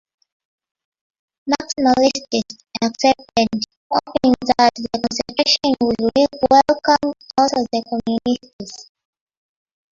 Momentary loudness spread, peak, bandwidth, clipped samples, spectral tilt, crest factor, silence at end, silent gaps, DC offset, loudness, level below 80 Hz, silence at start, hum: 10 LU; -2 dBFS; 7.6 kHz; under 0.1%; -3.5 dB/octave; 18 dB; 1.1 s; 3.77-3.90 s, 8.53-8.59 s; under 0.1%; -18 LUFS; -52 dBFS; 1.45 s; none